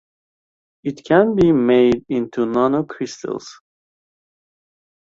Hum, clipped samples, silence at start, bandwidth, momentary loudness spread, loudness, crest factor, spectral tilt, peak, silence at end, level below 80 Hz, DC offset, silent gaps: none; under 0.1%; 0.85 s; 7.6 kHz; 15 LU; -17 LUFS; 18 dB; -7 dB/octave; -2 dBFS; 1.55 s; -50 dBFS; under 0.1%; none